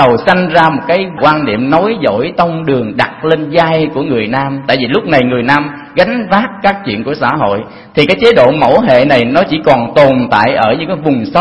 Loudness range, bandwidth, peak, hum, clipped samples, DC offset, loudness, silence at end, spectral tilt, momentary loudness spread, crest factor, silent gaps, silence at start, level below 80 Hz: 4 LU; 11 kHz; 0 dBFS; none; 0.7%; 0.2%; -10 LUFS; 0 s; -7 dB/octave; 6 LU; 10 dB; none; 0 s; -42 dBFS